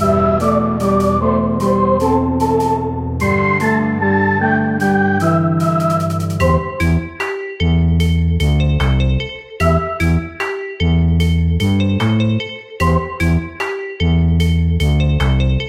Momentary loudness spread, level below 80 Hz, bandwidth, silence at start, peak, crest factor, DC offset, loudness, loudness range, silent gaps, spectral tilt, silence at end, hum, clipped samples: 5 LU; -26 dBFS; 15 kHz; 0 s; -2 dBFS; 14 dB; under 0.1%; -16 LUFS; 1 LU; none; -7 dB/octave; 0 s; none; under 0.1%